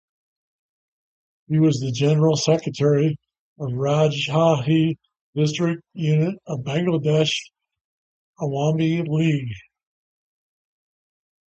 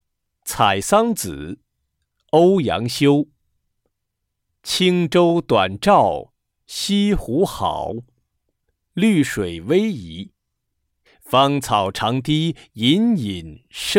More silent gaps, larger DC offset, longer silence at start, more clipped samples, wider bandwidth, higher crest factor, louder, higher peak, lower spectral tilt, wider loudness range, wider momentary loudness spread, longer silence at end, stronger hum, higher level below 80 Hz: first, 3.39-3.56 s, 5.21-5.33 s, 7.81-8.33 s vs none; neither; first, 1.5 s vs 0.45 s; neither; second, 8.2 kHz vs 17 kHz; about the same, 18 dB vs 18 dB; second, -21 LUFS vs -18 LUFS; about the same, -4 dBFS vs -2 dBFS; first, -6.5 dB/octave vs -5 dB/octave; about the same, 6 LU vs 4 LU; second, 11 LU vs 17 LU; first, 1.9 s vs 0 s; neither; second, -60 dBFS vs -44 dBFS